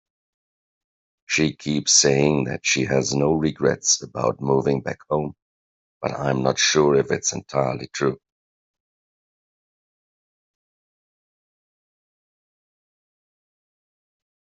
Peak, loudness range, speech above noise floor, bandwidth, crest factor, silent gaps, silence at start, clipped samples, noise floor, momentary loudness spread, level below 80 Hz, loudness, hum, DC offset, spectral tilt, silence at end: -4 dBFS; 9 LU; over 69 dB; 8.2 kHz; 22 dB; 5.42-6.01 s; 1.3 s; under 0.1%; under -90 dBFS; 10 LU; -56 dBFS; -21 LUFS; none; under 0.1%; -3.5 dB/octave; 6.25 s